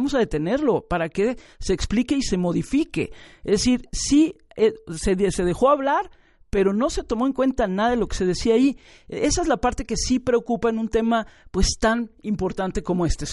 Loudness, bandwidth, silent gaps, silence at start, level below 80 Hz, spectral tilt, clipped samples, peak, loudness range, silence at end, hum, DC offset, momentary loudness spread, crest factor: -22 LUFS; 11.5 kHz; none; 0 s; -36 dBFS; -5 dB/octave; under 0.1%; -6 dBFS; 2 LU; 0 s; none; under 0.1%; 7 LU; 16 dB